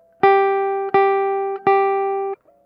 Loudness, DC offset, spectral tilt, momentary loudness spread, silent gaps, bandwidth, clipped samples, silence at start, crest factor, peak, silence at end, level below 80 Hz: -18 LUFS; under 0.1%; -8 dB/octave; 7 LU; none; 5.4 kHz; under 0.1%; 0.25 s; 18 dB; 0 dBFS; 0.3 s; -68 dBFS